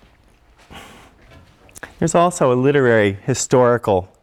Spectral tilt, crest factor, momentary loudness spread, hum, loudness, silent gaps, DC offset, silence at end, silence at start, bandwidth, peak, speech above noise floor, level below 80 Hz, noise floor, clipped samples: -5.5 dB/octave; 16 dB; 9 LU; none; -16 LUFS; none; under 0.1%; 0.15 s; 0.7 s; 14 kHz; -4 dBFS; 37 dB; -50 dBFS; -52 dBFS; under 0.1%